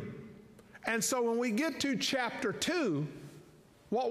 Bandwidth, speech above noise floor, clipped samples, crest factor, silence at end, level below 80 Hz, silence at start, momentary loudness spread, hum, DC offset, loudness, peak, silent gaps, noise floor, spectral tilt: 15.5 kHz; 27 dB; under 0.1%; 16 dB; 0 s; -70 dBFS; 0 s; 18 LU; none; under 0.1%; -33 LUFS; -18 dBFS; none; -59 dBFS; -3.5 dB/octave